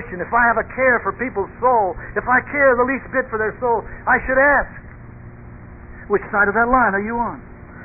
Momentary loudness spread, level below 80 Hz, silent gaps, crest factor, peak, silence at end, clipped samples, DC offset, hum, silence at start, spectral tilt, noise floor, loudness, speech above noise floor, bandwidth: 10 LU; -40 dBFS; none; 16 dB; -2 dBFS; 0 s; under 0.1%; under 0.1%; none; 0 s; -12 dB/octave; -38 dBFS; -18 LUFS; 20 dB; 2.9 kHz